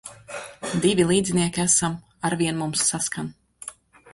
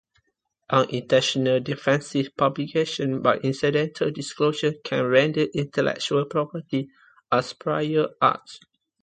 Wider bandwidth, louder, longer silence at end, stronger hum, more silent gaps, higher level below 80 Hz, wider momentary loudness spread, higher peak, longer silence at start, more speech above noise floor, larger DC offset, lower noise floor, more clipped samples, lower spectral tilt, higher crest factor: first, 11.5 kHz vs 9.4 kHz; about the same, -22 LUFS vs -23 LUFS; about the same, 0.4 s vs 0.45 s; neither; neither; first, -54 dBFS vs -64 dBFS; first, 18 LU vs 7 LU; about the same, -6 dBFS vs -4 dBFS; second, 0.05 s vs 0.7 s; second, 20 dB vs 50 dB; neither; second, -43 dBFS vs -73 dBFS; neither; second, -3.5 dB/octave vs -5.5 dB/octave; about the same, 18 dB vs 20 dB